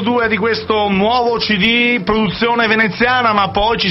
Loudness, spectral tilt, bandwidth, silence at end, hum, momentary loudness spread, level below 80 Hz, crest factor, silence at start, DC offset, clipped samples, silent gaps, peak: -13 LUFS; -6.5 dB/octave; 6 kHz; 0 s; none; 3 LU; -38 dBFS; 12 dB; 0 s; under 0.1%; under 0.1%; none; -2 dBFS